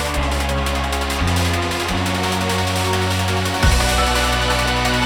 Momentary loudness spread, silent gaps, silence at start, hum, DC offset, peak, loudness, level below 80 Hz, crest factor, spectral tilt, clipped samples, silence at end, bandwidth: 4 LU; none; 0 s; none; under 0.1%; -2 dBFS; -18 LUFS; -24 dBFS; 16 dB; -4 dB/octave; under 0.1%; 0 s; 20 kHz